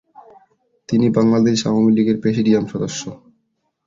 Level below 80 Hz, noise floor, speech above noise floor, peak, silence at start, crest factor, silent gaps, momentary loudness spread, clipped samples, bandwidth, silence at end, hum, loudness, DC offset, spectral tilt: -56 dBFS; -69 dBFS; 53 dB; -2 dBFS; 0.9 s; 16 dB; none; 10 LU; under 0.1%; 7.6 kHz; 0.7 s; none; -17 LUFS; under 0.1%; -6 dB/octave